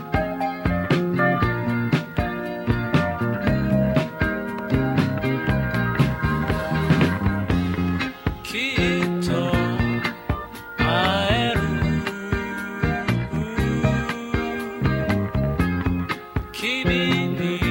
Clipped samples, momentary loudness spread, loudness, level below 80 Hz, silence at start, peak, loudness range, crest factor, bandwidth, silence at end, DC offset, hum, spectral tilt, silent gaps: under 0.1%; 7 LU; -23 LUFS; -34 dBFS; 0 s; -4 dBFS; 2 LU; 18 dB; 16.5 kHz; 0 s; under 0.1%; none; -6.5 dB/octave; none